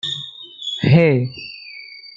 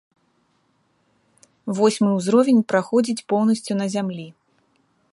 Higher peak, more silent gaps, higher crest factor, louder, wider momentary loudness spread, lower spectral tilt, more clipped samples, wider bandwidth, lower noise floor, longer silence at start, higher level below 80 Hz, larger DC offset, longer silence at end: about the same, -2 dBFS vs -4 dBFS; neither; about the same, 18 dB vs 18 dB; first, -17 LUFS vs -20 LUFS; first, 20 LU vs 13 LU; about the same, -7 dB/octave vs -6 dB/octave; neither; second, 7.6 kHz vs 11.5 kHz; second, -38 dBFS vs -66 dBFS; second, 0.05 s vs 1.65 s; first, -58 dBFS vs -72 dBFS; neither; second, 0.1 s vs 0.8 s